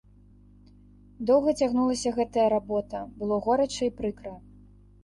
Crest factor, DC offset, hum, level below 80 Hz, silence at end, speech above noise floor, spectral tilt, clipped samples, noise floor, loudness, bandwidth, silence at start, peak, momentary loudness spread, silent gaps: 16 dB; under 0.1%; 50 Hz at -50 dBFS; -54 dBFS; 0.65 s; 29 dB; -5 dB/octave; under 0.1%; -54 dBFS; -26 LUFS; 11.5 kHz; 1.2 s; -10 dBFS; 11 LU; none